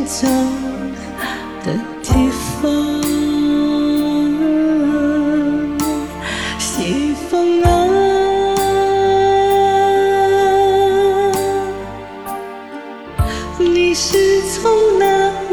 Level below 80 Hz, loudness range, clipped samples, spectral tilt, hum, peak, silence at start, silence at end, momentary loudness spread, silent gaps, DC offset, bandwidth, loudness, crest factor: -32 dBFS; 5 LU; under 0.1%; -5 dB/octave; none; 0 dBFS; 0 s; 0 s; 12 LU; none; 0.4%; over 20 kHz; -15 LUFS; 14 dB